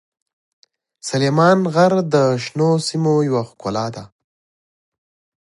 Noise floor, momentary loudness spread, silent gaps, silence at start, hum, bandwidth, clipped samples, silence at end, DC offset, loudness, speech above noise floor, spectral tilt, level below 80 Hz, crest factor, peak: under -90 dBFS; 11 LU; none; 1.05 s; none; 11.5 kHz; under 0.1%; 1.4 s; under 0.1%; -17 LUFS; over 73 dB; -6 dB/octave; -60 dBFS; 18 dB; 0 dBFS